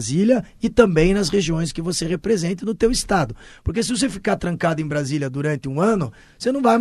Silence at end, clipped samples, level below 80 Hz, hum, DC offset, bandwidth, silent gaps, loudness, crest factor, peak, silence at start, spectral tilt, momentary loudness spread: 0 s; under 0.1%; -38 dBFS; none; under 0.1%; 13 kHz; none; -21 LUFS; 20 dB; 0 dBFS; 0 s; -5.5 dB/octave; 7 LU